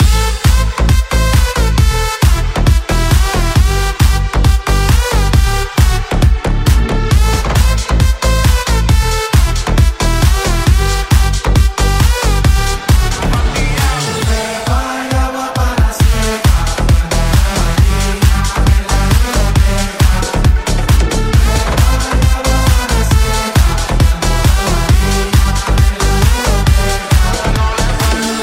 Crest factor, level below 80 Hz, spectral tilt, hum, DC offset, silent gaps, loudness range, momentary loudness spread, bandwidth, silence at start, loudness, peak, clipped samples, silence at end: 10 dB; -12 dBFS; -4.5 dB/octave; none; under 0.1%; none; 1 LU; 2 LU; 16.5 kHz; 0 s; -13 LUFS; 0 dBFS; under 0.1%; 0 s